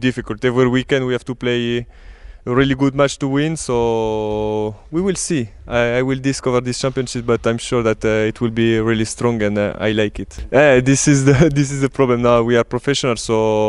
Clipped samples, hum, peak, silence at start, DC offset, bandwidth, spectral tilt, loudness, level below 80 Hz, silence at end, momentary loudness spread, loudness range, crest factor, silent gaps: under 0.1%; none; 0 dBFS; 0 s; under 0.1%; 11.5 kHz; -5.5 dB/octave; -17 LUFS; -38 dBFS; 0 s; 8 LU; 5 LU; 16 dB; none